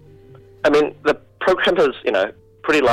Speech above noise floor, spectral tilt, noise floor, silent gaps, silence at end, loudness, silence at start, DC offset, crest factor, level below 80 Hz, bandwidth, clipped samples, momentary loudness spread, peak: 28 dB; -4.5 dB/octave; -45 dBFS; none; 0 s; -19 LUFS; 0.65 s; under 0.1%; 16 dB; -52 dBFS; 13 kHz; under 0.1%; 5 LU; -4 dBFS